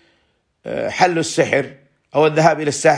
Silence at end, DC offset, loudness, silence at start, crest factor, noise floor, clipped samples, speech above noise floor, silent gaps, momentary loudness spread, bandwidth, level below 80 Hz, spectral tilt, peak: 0 s; under 0.1%; -17 LUFS; 0.65 s; 18 dB; -64 dBFS; under 0.1%; 48 dB; none; 14 LU; 10.5 kHz; -60 dBFS; -4.5 dB/octave; 0 dBFS